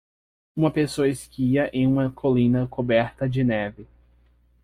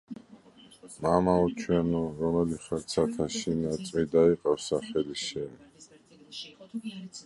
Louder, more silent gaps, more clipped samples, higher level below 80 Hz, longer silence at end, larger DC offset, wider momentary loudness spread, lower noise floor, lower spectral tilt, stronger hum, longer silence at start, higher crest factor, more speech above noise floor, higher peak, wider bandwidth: first, -23 LUFS vs -28 LUFS; neither; neither; about the same, -50 dBFS vs -54 dBFS; first, 0.8 s vs 0.05 s; neither; second, 5 LU vs 18 LU; first, -59 dBFS vs -55 dBFS; first, -7.5 dB/octave vs -6 dB/octave; neither; first, 0.55 s vs 0.1 s; about the same, 16 dB vs 20 dB; first, 37 dB vs 27 dB; about the same, -8 dBFS vs -10 dBFS; first, 14 kHz vs 11.5 kHz